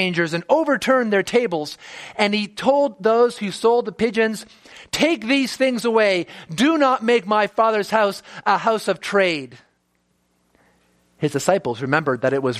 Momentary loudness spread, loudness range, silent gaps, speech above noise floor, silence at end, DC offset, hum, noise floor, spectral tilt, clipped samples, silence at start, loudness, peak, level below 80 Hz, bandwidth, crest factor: 8 LU; 5 LU; none; 47 dB; 0 s; under 0.1%; none; -67 dBFS; -4.5 dB/octave; under 0.1%; 0 s; -19 LUFS; 0 dBFS; -62 dBFS; 15 kHz; 20 dB